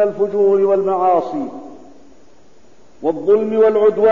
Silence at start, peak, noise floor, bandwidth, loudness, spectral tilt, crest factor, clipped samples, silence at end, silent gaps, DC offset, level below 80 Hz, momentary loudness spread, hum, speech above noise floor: 0 s; -4 dBFS; -50 dBFS; 7 kHz; -15 LUFS; -8 dB/octave; 12 dB; under 0.1%; 0 s; none; 0.9%; -58 dBFS; 12 LU; none; 36 dB